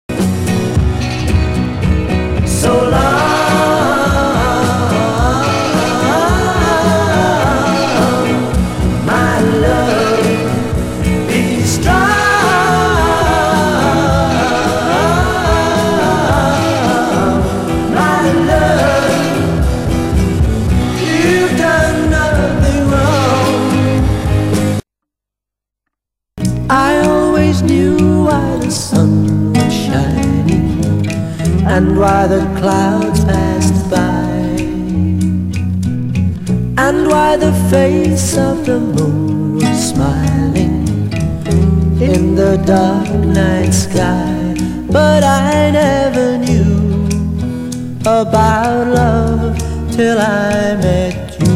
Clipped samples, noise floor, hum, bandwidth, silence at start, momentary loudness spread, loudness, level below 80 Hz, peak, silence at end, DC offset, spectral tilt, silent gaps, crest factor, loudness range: under 0.1%; -83 dBFS; none; 16 kHz; 0.1 s; 5 LU; -13 LUFS; -24 dBFS; 0 dBFS; 0 s; under 0.1%; -6 dB/octave; none; 12 dB; 2 LU